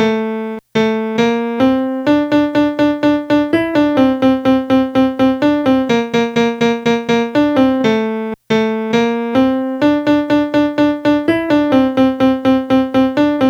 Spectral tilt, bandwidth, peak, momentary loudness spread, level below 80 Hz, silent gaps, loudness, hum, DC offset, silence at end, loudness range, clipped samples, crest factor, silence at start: -6 dB/octave; 7.8 kHz; 0 dBFS; 3 LU; -46 dBFS; none; -14 LUFS; none; under 0.1%; 0 s; 1 LU; under 0.1%; 14 dB; 0 s